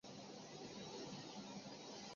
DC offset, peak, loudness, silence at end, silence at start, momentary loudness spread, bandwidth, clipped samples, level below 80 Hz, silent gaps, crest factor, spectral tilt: under 0.1%; -40 dBFS; -53 LUFS; 0 s; 0.05 s; 3 LU; 7.4 kHz; under 0.1%; -82 dBFS; none; 12 dB; -3.5 dB/octave